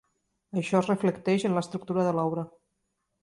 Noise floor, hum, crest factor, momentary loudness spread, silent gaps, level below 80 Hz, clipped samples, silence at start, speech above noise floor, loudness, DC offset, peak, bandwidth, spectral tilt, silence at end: -79 dBFS; none; 18 dB; 9 LU; none; -68 dBFS; under 0.1%; 0.55 s; 52 dB; -28 LUFS; under 0.1%; -10 dBFS; 11.5 kHz; -7 dB/octave; 0.75 s